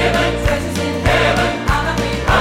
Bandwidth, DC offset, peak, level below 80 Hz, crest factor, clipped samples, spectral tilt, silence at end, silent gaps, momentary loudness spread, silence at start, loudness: 16.5 kHz; under 0.1%; -4 dBFS; -24 dBFS; 12 dB; under 0.1%; -5 dB/octave; 0 s; none; 5 LU; 0 s; -16 LUFS